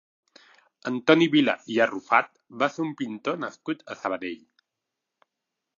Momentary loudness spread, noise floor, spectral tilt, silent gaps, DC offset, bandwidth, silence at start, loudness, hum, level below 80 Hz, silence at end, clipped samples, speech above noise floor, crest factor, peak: 15 LU; -85 dBFS; -5.5 dB/octave; none; under 0.1%; 7.4 kHz; 0.85 s; -25 LUFS; none; -78 dBFS; 1.4 s; under 0.1%; 60 dB; 22 dB; -4 dBFS